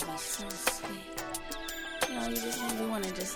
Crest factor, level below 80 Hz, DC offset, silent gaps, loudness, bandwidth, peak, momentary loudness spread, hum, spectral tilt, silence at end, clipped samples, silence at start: 24 dB; -52 dBFS; under 0.1%; none; -34 LUFS; over 20 kHz; -12 dBFS; 6 LU; none; -2 dB/octave; 0 s; under 0.1%; 0 s